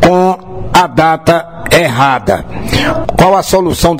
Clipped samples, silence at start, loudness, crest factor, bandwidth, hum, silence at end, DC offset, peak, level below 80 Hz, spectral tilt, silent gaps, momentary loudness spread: 0.5%; 0 s; -10 LUFS; 10 dB; 16.5 kHz; none; 0 s; under 0.1%; 0 dBFS; -28 dBFS; -5 dB/octave; none; 7 LU